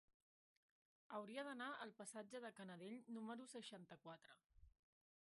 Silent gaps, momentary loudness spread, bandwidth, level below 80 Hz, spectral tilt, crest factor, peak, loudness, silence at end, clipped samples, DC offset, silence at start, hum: 4.46-4.50 s; 10 LU; 11.5 kHz; -84 dBFS; -4 dB/octave; 18 dB; -40 dBFS; -55 LUFS; 0.5 s; under 0.1%; under 0.1%; 1.1 s; none